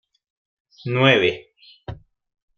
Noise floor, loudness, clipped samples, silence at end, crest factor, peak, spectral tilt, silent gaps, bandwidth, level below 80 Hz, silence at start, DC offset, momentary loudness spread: -38 dBFS; -18 LUFS; under 0.1%; 0.65 s; 22 dB; -2 dBFS; -6.5 dB/octave; none; 6.8 kHz; -54 dBFS; 0.85 s; under 0.1%; 23 LU